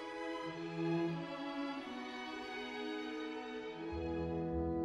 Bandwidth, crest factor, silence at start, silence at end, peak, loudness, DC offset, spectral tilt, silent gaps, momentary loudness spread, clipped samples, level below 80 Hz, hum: 9.6 kHz; 14 dB; 0 s; 0 s; -26 dBFS; -42 LUFS; under 0.1%; -6.5 dB/octave; none; 6 LU; under 0.1%; -56 dBFS; none